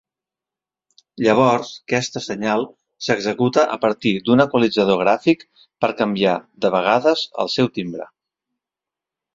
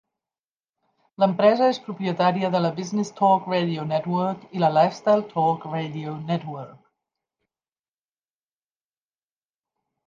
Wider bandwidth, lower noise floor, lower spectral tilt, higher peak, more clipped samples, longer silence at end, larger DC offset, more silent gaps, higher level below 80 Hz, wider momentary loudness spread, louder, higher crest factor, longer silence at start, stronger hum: about the same, 7.8 kHz vs 7.6 kHz; about the same, -88 dBFS vs under -90 dBFS; about the same, -5.5 dB/octave vs -6.5 dB/octave; first, 0 dBFS vs -6 dBFS; neither; second, 1.3 s vs 3.35 s; neither; neither; first, -60 dBFS vs -74 dBFS; second, 8 LU vs 11 LU; first, -19 LUFS vs -23 LUFS; about the same, 20 dB vs 20 dB; about the same, 1.2 s vs 1.2 s; neither